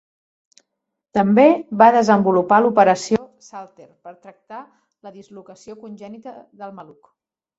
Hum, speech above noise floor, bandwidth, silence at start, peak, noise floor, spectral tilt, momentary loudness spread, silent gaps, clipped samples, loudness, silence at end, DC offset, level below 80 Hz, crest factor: none; 61 dB; 8 kHz; 1.15 s; -2 dBFS; -79 dBFS; -6 dB/octave; 25 LU; none; under 0.1%; -15 LUFS; 0.75 s; under 0.1%; -62 dBFS; 18 dB